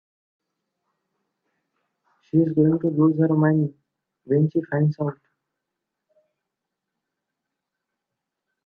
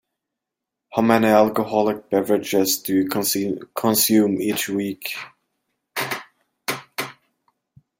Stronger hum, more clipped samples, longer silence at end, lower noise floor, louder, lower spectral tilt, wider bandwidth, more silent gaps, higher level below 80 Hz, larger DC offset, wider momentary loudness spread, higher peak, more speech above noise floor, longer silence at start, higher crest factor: neither; neither; first, 3.55 s vs 0.9 s; about the same, -84 dBFS vs -84 dBFS; about the same, -21 LUFS vs -21 LUFS; first, -12.5 dB/octave vs -4 dB/octave; second, 2.1 kHz vs 17 kHz; neither; about the same, -68 dBFS vs -64 dBFS; neither; second, 7 LU vs 14 LU; second, -6 dBFS vs -2 dBFS; about the same, 64 dB vs 64 dB; first, 2.35 s vs 0.9 s; about the same, 18 dB vs 20 dB